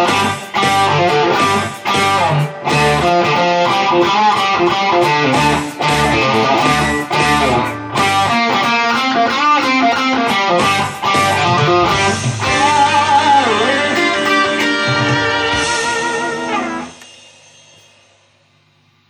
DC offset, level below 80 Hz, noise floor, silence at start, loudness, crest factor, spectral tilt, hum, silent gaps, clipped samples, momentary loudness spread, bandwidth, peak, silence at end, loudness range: under 0.1%; -42 dBFS; -54 dBFS; 0 s; -13 LUFS; 14 dB; -4 dB/octave; none; none; under 0.1%; 5 LU; over 20 kHz; 0 dBFS; 2.05 s; 4 LU